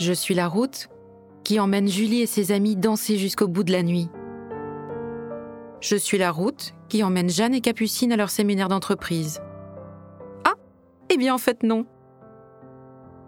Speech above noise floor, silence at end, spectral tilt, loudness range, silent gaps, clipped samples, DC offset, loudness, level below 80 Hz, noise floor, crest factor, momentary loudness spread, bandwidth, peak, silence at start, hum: 31 dB; 0 s; -5 dB/octave; 4 LU; none; under 0.1%; under 0.1%; -23 LUFS; -64 dBFS; -53 dBFS; 24 dB; 15 LU; over 20 kHz; 0 dBFS; 0 s; none